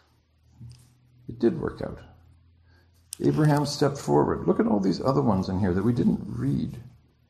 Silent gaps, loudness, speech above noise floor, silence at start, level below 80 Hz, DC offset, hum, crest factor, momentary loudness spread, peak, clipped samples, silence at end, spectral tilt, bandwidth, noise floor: none; -25 LUFS; 38 dB; 0.6 s; -52 dBFS; under 0.1%; none; 18 dB; 14 LU; -8 dBFS; under 0.1%; 0.4 s; -7 dB/octave; 13 kHz; -63 dBFS